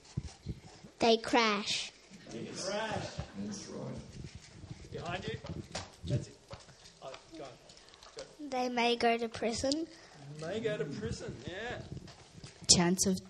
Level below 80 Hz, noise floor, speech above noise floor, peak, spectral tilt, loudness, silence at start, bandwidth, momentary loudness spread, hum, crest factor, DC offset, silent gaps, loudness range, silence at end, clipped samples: -58 dBFS; -57 dBFS; 23 dB; -8 dBFS; -3.5 dB/octave; -33 LUFS; 0.05 s; 12.5 kHz; 23 LU; none; 28 dB; under 0.1%; none; 9 LU; 0 s; under 0.1%